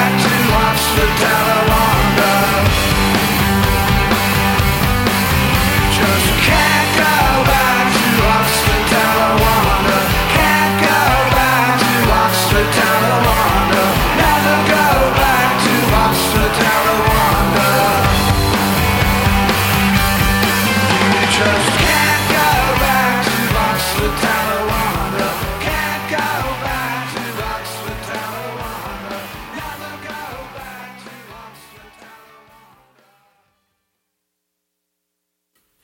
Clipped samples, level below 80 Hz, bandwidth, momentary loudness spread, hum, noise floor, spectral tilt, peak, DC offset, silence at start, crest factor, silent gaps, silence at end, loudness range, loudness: under 0.1%; -26 dBFS; 17 kHz; 12 LU; none; -75 dBFS; -4 dB/octave; -2 dBFS; under 0.1%; 0 s; 14 dB; none; 4.35 s; 13 LU; -13 LUFS